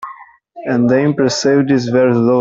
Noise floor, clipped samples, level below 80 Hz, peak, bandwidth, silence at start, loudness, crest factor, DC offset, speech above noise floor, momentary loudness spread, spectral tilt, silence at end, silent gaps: -38 dBFS; under 0.1%; -54 dBFS; -2 dBFS; 7.8 kHz; 0 s; -13 LUFS; 12 dB; under 0.1%; 25 dB; 9 LU; -6 dB/octave; 0 s; none